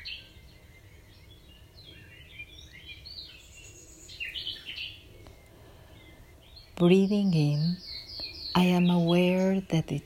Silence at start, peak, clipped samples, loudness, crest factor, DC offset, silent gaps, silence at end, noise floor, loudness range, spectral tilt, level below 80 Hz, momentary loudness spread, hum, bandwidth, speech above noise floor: 0 s; -8 dBFS; under 0.1%; -27 LUFS; 22 dB; under 0.1%; none; 0.05 s; -53 dBFS; 21 LU; -7 dB/octave; -56 dBFS; 25 LU; none; 14.5 kHz; 29 dB